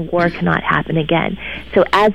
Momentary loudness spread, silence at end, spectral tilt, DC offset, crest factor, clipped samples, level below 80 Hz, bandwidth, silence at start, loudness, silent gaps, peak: 6 LU; 0 s; -7 dB/octave; 1%; 14 dB; under 0.1%; -40 dBFS; 12 kHz; 0 s; -17 LUFS; none; -2 dBFS